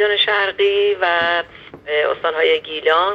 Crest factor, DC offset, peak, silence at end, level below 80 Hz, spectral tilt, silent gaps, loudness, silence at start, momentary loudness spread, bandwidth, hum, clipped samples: 16 dB; under 0.1%; -2 dBFS; 0 s; -58 dBFS; -4 dB/octave; none; -17 LUFS; 0 s; 7 LU; 6 kHz; none; under 0.1%